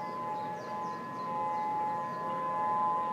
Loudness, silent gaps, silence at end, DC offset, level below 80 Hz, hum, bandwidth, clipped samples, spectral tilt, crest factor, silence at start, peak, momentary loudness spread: -34 LUFS; none; 0 s; under 0.1%; -76 dBFS; none; 15 kHz; under 0.1%; -6 dB/octave; 12 dB; 0 s; -22 dBFS; 7 LU